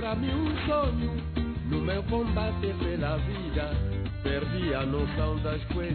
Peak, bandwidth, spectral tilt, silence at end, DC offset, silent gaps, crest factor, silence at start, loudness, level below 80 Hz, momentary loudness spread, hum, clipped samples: -16 dBFS; 4.5 kHz; -10.5 dB/octave; 0 s; under 0.1%; none; 14 dB; 0 s; -30 LUFS; -34 dBFS; 4 LU; none; under 0.1%